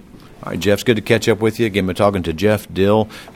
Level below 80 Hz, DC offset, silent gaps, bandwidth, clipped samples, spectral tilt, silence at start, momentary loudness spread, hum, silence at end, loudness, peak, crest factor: -44 dBFS; under 0.1%; none; 18 kHz; under 0.1%; -6 dB/octave; 0.15 s; 3 LU; none; 0.05 s; -17 LUFS; 0 dBFS; 16 dB